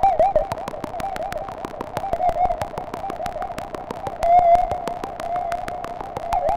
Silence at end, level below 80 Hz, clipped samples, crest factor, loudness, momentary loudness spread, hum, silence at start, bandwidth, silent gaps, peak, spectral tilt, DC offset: 0 s; -38 dBFS; under 0.1%; 18 dB; -23 LUFS; 14 LU; none; 0 s; 16 kHz; none; -4 dBFS; -5.5 dB/octave; under 0.1%